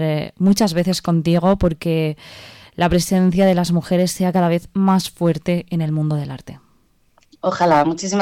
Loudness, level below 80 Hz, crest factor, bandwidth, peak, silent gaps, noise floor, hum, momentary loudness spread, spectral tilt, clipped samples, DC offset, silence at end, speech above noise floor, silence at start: -18 LUFS; -40 dBFS; 14 dB; 16 kHz; -4 dBFS; none; -57 dBFS; none; 9 LU; -6 dB/octave; under 0.1%; under 0.1%; 0 s; 40 dB; 0 s